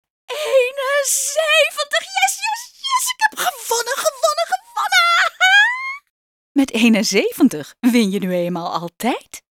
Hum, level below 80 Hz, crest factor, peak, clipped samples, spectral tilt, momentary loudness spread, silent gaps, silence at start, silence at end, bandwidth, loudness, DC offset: none; -64 dBFS; 16 dB; -2 dBFS; under 0.1%; -2.5 dB/octave; 11 LU; 6.10-6.55 s; 0.3 s; 0.15 s; 18 kHz; -17 LUFS; under 0.1%